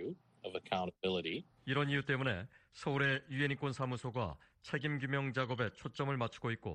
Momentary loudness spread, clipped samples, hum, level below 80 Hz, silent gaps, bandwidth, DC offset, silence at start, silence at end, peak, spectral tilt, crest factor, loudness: 10 LU; under 0.1%; none; -66 dBFS; none; 9.4 kHz; under 0.1%; 0 s; 0 s; -18 dBFS; -6.5 dB/octave; 20 dB; -38 LUFS